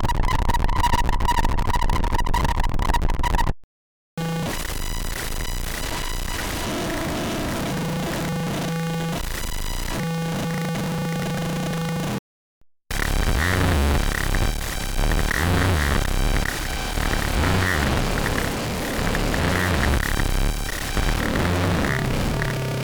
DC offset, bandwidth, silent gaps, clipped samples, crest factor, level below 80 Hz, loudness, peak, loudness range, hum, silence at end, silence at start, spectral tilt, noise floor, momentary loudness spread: under 0.1%; over 20 kHz; 3.64-4.17 s, 12.19-12.61 s; under 0.1%; 14 dB; -26 dBFS; -24 LUFS; -8 dBFS; 5 LU; none; 0 s; 0 s; -4.5 dB/octave; under -90 dBFS; 7 LU